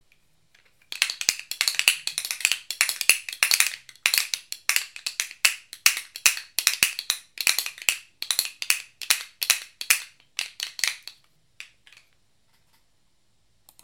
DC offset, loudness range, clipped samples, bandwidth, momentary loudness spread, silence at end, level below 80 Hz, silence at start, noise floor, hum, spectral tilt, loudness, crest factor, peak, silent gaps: under 0.1%; 7 LU; under 0.1%; 17 kHz; 9 LU; 2.2 s; -70 dBFS; 0.9 s; -70 dBFS; none; 3.5 dB/octave; -23 LUFS; 28 dB; 0 dBFS; none